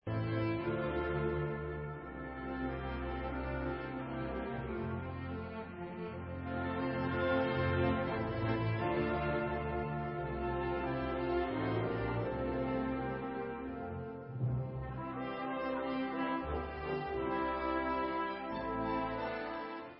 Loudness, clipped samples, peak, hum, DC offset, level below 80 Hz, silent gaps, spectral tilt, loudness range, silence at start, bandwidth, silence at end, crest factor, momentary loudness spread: -37 LUFS; under 0.1%; -22 dBFS; none; under 0.1%; -50 dBFS; none; -6 dB/octave; 6 LU; 0.05 s; 5.6 kHz; 0 s; 14 dB; 8 LU